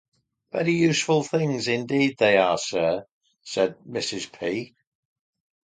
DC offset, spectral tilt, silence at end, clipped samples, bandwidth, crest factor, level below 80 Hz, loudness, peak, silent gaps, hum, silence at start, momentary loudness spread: under 0.1%; -4.5 dB/octave; 1 s; under 0.1%; 9.6 kHz; 20 dB; -64 dBFS; -24 LUFS; -4 dBFS; 3.12-3.21 s; none; 0.55 s; 12 LU